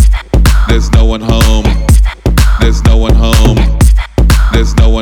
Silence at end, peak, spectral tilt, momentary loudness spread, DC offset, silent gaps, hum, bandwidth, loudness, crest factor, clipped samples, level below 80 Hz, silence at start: 0 s; 0 dBFS; -5.5 dB/octave; 2 LU; under 0.1%; none; none; 15.5 kHz; -9 LUFS; 6 dB; 1%; -8 dBFS; 0 s